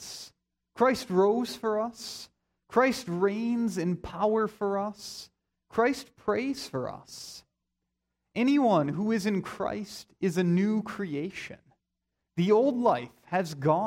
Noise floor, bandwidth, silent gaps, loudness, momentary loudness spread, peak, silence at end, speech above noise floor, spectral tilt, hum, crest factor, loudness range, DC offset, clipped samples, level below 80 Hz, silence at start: -84 dBFS; 16 kHz; none; -28 LUFS; 17 LU; -10 dBFS; 0 s; 56 dB; -6 dB/octave; none; 18 dB; 4 LU; under 0.1%; under 0.1%; -64 dBFS; 0 s